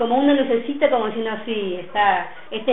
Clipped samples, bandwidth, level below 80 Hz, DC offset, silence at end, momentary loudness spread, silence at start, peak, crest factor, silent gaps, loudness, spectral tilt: under 0.1%; 4 kHz; -58 dBFS; 1%; 0 s; 9 LU; 0 s; -4 dBFS; 16 dB; none; -21 LUFS; -9.5 dB/octave